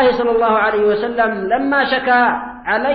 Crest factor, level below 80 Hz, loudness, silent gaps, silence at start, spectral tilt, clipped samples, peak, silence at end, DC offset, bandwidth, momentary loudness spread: 12 dB; -48 dBFS; -15 LUFS; none; 0 s; -7.5 dB/octave; under 0.1%; -4 dBFS; 0 s; under 0.1%; 6 kHz; 4 LU